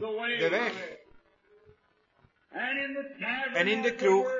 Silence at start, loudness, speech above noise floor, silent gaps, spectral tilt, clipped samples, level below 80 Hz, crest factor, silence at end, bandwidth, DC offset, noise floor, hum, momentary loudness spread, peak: 0 s; -29 LUFS; 40 dB; none; -4 dB/octave; under 0.1%; -74 dBFS; 18 dB; 0 s; 7.6 kHz; under 0.1%; -68 dBFS; none; 12 LU; -12 dBFS